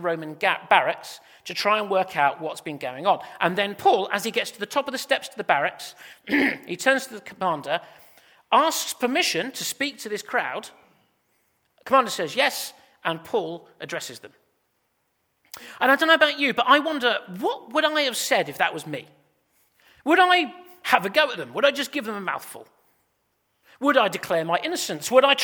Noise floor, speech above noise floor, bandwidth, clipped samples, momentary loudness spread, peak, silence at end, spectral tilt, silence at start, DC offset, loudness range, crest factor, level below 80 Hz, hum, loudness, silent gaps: -72 dBFS; 49 dB; over 20 kHz; under 0.1%; 15 LU; 0 dBFS; 0 s; -2.5 dB/octave; 0 s; under 0.1%; 5 LU; 24 dB; -74 dBFS; none; -23 LUFS; none